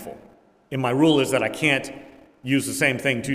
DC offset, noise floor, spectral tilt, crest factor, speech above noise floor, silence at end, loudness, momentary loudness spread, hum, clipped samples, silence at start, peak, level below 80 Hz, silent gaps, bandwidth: under 0.1%; -53 dBFS; -4.5 dB/octave; 20 dB; 31 dB; 0 s; -21 LUFS; 19 LU; none; under 0.1%; 0 s; -4 dBFS; -60 dBFS; none; 16 kHz